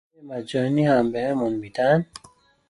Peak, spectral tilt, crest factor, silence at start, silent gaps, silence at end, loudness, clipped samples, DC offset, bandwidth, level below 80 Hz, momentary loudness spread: -8 dBFS; -7.5 dB/octave; 16 dB; 0.2 s; none; 0.65 s; -22 LUFS; under 0.1%; under 0.1%; 11.5 kHz; -60 dBFS; 15 LU